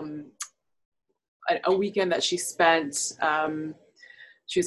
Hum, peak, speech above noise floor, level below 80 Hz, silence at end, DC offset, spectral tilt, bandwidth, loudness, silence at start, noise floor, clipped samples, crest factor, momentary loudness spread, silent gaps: none; -6 dBFS; 26 dB; -70 dBFS; 0 s; under 0.1%; -2.5 dB/octave; 13 kHz; -25 LUFS; 0 s; -52 dBFS; under 0.1%; 22 dB; 17 LU; 0.85-0.92 s, 1.28-1.40 s